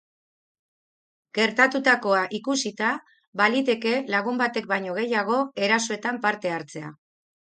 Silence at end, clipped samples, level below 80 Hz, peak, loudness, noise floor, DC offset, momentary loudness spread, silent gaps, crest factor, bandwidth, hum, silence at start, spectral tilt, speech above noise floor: 0.65 s; under 0.1%; -76 dBFS; -2 dBFS; -24 LUFS; under -90 dBFS; under 0.1%; 13 LU; 3.27-3.33 s; 22 dB; 9.4 kHz; none; 1.35 s; -3.5 dB/octave; over 66 dB